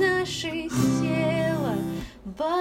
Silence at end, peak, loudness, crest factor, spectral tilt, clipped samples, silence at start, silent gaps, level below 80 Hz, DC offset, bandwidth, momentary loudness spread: 0 s; -10 dBFS; -26 LUFS; 16 dB; -5.5 dB/octave; under 0.1%; 0 s; none; -50 dBFS; under 0.1%; 16 kHz; 9 LU